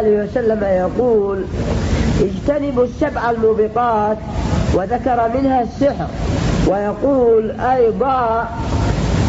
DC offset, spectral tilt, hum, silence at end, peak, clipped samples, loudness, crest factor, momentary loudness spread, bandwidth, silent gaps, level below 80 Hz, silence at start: under 0.1%; -7.5 dB/octave; none; 0 s; -6 dBFS; under 0.1%; -17 LUFS; 10 dB; 5 LU; 8 kHz; none; -28 dBFS; 0 s